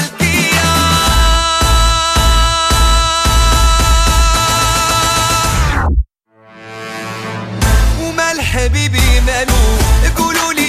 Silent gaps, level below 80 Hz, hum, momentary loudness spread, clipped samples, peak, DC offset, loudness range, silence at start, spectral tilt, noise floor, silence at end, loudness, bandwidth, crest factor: none; -14 dBFS; none; 9 LU; under 0.1%; 0 dBFS; under 0.1%; 5 LU; 0 s; -3.5 dB/octave; -45 dBFS; 0 s; -12 LUFS; 15.5 kHz; 12 dB